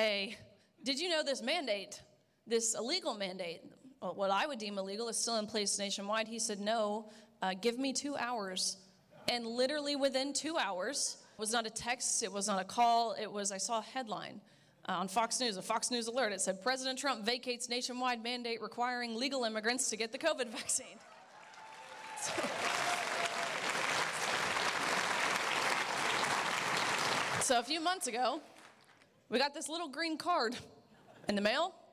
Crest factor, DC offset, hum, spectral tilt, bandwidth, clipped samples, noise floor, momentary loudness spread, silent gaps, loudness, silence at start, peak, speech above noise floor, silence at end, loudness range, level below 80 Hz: 16 dB; under 0.1%; none; -1.5 dB/octave; 16 kHz; under 0.1%; -65 dBFS; 8 LU; none; -35 LUFS; 0 s; -20 dBFS; 29 dB; 0.1 s; 4 LU; -76 dBFS